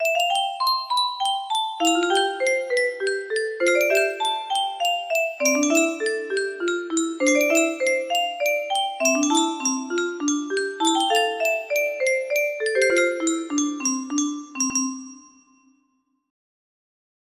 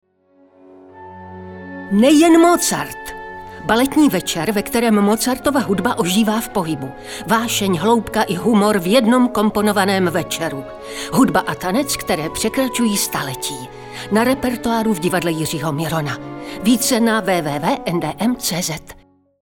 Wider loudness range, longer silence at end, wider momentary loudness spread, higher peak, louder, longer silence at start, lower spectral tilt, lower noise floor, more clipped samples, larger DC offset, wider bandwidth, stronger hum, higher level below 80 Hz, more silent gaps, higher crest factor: about the same, 3 LU vs 4 LU; first, 2.1 s vs 0.5 s; second, 6 LU vs 16 LU; second, -6 dBFS vs -2 dBFS; second, -22 LUFS vs -17 LUFS; second, 0 s vs 0.95 s; second, 0 dB/octave vs -4.5 dB/octave; first, -69 dBFS vs -54 dBFS; neither; neither; second, 15.5 kHz vs 19.5 kHz; neither; second, -72 dBFS vs -46 dBFS; neither; about the same, 18 dB vs 16 dB